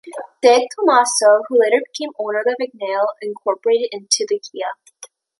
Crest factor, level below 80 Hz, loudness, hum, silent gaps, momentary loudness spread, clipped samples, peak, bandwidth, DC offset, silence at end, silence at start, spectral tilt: 16 dB; -74 dBFS; -17 LUFS; none; none; 14 LU; under 0.1%; -2 dBFS; 11.5 kHz; under 0.1%; 0.35 s; 0.05 s; -1 dB/octave